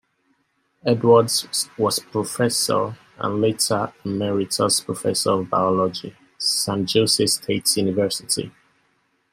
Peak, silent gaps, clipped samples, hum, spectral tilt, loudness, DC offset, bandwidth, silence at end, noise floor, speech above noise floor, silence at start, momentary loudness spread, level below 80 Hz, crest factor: -4 dBFS; none; under 0.1%; none; -3.5 dB/octave; -20 LUFS; under 0.1%; 16 kHz; 0.85 s; -68 dBFS; 47 dB; 0.85 s; 9 LU; -62 dBFS; 18 dB